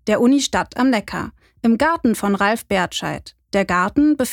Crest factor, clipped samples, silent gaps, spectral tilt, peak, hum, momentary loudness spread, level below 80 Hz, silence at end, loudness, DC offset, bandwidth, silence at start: 16 dB; under 0.1%; none; -4.5 dB/octave; -2 dBFS; none; 12 LU; -46 dBFS; 0 s; -19 LUFS; under 0.1%; 18.5 kHz; 0.05 s